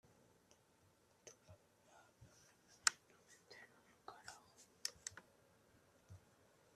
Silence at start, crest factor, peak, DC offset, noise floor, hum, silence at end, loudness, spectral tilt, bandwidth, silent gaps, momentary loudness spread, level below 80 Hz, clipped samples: 1.25 s; 38 dB; -14 dBFS; under 0.1%; -74 dBFS; none; 0.6 s; -44 LUFS; 0.5 dB/octave; 14 kHz; none; 29 LU; -86 dBFS; under 0.1%